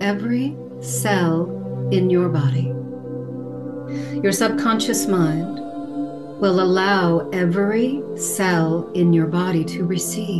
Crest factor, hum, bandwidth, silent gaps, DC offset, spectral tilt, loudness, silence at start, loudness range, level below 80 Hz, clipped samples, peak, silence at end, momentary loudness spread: 14 dB; none; 12.5 kHz; none; 0.3%; -5.5 dB/octave; -20 LUFS; 0 s; 3 LU; -62 dBFS; under 0.1%; -6 dBFS; 0 s; 13 LU